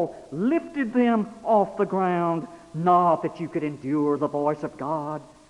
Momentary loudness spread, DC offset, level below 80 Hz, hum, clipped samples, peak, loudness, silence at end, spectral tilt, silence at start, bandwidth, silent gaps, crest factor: 9 LU; under 0.1%; -64 dBFS; none; under 0.1%; -6 dBFS; -24 LUFS; 0.25 s; -8.5 dB/octave; 0 s; 11 kHz; none; 18 dB